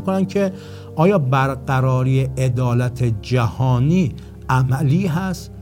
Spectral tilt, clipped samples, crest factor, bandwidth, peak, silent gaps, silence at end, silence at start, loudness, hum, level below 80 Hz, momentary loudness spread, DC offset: -7.5 dB/octave; under 0.1%; 14 dB; 15.5 kHz; -4 dBFS; none; 0 s; 0 s; -19 LUFS; none; -40 dBFS; 7 LU; under 0.1%